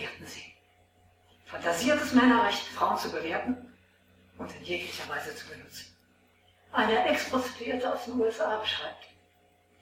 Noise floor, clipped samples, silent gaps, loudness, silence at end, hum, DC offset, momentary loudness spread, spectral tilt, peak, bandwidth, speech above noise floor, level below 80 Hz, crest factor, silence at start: -65 dBFS; under 0.1%; none; -29 LUFS; 0.75 s; none; under 0.1%; 20 LU; -3.5 dB/octave; -10 dBFS; 16.5 kHz; 36 dB; -66 dBFS; 22 dB; 0 s